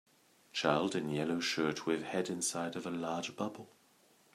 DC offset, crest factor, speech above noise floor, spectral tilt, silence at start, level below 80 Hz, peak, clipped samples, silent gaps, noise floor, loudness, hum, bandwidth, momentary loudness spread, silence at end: under 0.1%; 22 dB; 32 dB; -4 dB/octave; 0.55 s; -76 dBFS; -14 dBFS; under 0.1%; none; -68 dBFS; -36 LUFS; none; 14.5 kHz; 9 LU; 0.65 s